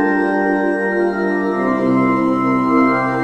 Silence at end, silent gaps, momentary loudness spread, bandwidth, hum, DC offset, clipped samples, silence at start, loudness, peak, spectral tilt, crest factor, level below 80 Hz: 0 s; none; 3 LU; 8.8 kHz; none; under 0.1%; under 0.1%; 0 s; -16 LUFS; -2 dBFS; -8 dB/octave; 14 dB; -50 dBFS